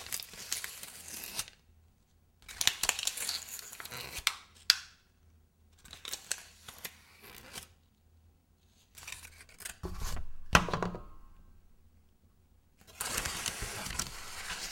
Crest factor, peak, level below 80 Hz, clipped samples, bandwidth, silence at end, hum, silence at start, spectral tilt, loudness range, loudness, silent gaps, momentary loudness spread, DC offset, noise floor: 36 dB; -2 dBFS; -50 dBFS; under 0.1%; 17 kHz; 0 s; none; 0 s; -1.5 dB/octave; 13 LU; -35 LUFS; none; 22 LU; under 0.1%; -67 dBFS